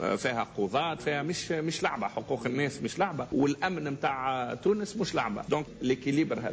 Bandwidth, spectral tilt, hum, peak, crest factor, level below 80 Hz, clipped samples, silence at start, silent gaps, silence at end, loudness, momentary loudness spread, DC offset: 8 kHz; -5 dB/octave; none; -16 dBFS; 14 dB; -60 dBFS; under 0.1%; 0 s; none; 0 s; -30 LUFS; 3 LU; under 0.1%